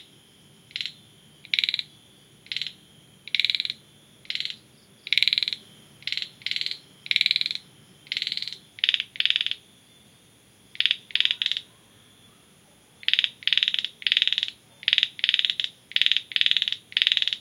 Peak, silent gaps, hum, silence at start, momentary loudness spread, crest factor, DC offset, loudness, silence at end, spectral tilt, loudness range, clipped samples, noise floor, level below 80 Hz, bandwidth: -2 dBFS; none; none; 0.75 s; 12 LU; 28 dB; under 0.1%; -24 LUFS; 0 s; 1 dB/octave; 6 LU; under 0.1%; -56 dBFS; -76 dBFS; 17 kHz